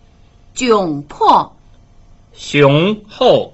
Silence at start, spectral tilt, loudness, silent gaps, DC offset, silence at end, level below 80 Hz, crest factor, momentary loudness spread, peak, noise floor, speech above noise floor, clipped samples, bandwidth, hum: 0.55 s; -5.5 dB/octave; -13 LUFS; none; under 0.1%; 0.05 s; -46 dBFS; 14 dB; 15 LU; 0 dBFS; -45 dBFS; 33 dB; under 0.1%; 8.2 kHz; none